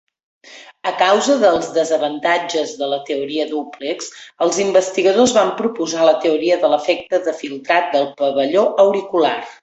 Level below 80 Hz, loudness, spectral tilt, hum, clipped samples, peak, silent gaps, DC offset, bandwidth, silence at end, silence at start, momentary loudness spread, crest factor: -62 dBFS; -17 LUFS; -3 dB/octave; none; under 0.1%; 0 dBFS; none; under 0.1%; 8.2 kHz; 0.1 s; 0.45 s; 10 LU; 16 dB